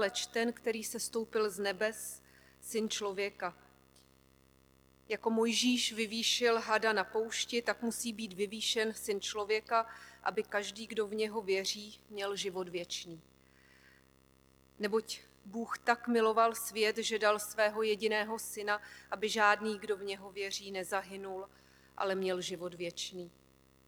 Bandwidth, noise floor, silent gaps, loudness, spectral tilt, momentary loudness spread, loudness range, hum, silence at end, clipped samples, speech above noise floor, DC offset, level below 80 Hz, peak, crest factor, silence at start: over 20 kHz; -66 dBFS; none; -34 LUFS; -2.5 dB/octave; 13 LU; 8 LU; 50 Hz at -65 dBFS; 0.6 s; under 0.1%; 31 dB; under 0.1%; -72 dBFS; -12 dBFS; 22 dB; 0 s